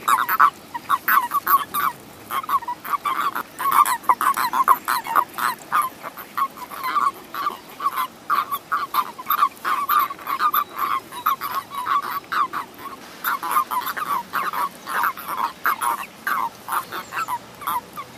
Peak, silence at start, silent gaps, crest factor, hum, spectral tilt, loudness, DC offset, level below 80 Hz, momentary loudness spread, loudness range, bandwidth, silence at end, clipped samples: -2 dBFS; 0 s; none; 22 dB; none; -1.5 dB/octave; -22 LUFS; under 0.1%; -66 dBFS; 10 LU; 4 LU; 16 kHz; 0 s; under 0.1%